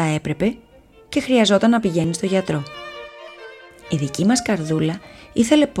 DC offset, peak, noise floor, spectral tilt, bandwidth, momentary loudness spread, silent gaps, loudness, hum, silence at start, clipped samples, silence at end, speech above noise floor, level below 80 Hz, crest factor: under 0.1%; -2 dBFS; -41 dBFS; -5 dB/octave; 14 kHz; 21 LU; none; -19 LUFS; none; 0 s; under 0.1%; 0 s; 22 dB; -50 dBFS; 18 dB